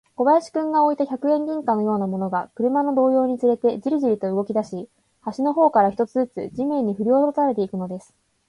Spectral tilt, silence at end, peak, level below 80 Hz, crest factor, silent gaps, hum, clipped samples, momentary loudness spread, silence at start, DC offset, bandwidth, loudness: -8 dB/octave; 0.5 s; -6 dBFS; -66 dBFS; 16 dB; none; none; under 0.1%; 8 LU; 0.2 s; under 0.1%; 11 kHz; -21 LUFS